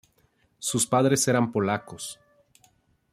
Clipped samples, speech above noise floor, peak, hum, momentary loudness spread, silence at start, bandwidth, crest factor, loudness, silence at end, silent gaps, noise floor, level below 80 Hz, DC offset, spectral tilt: under 0.1%; 42 dB; -8 dBFS; none; 16 LU; 0.6 s; 16 kHz; 18 dB; -24 LUFS; 1 s; none; -66 dBFS; -64 dBFS; under 0.1%; -4 dB/octave